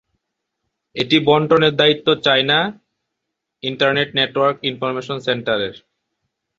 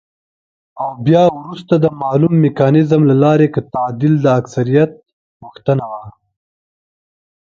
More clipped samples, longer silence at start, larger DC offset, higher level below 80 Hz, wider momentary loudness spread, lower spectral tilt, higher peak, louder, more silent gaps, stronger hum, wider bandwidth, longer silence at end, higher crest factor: neither; first, 0.95 s vs 0.75 s; neither; about the same, -58 dBFS vs -54 dBFS; about the same, 11 LU vs 12 LU; second, -5.5 dB/octave vs -9 dB/octave; about the same, -2 dBFS vs 0 dBFS; second, -17 LUFS vs -14 LUFS; second, none vs 5.13-5.40 s; neither; about the same, 7.6 kHz vs 7.2 kHz; second, 0.8 s vs 1.5 s; about the same, 18 dB vs 14 dB